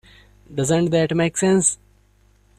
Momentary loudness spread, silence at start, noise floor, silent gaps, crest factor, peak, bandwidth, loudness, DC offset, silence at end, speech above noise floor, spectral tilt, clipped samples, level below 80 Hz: 12 LU; 0.5 s; -57 dBFS; none; 16 dB; -4 dBFS; 14 kHz; -19 LUFS; under 0.1%; 0.85 s; 38 dB; -4.5 dB/octave; under 0.1%; -52 dBFS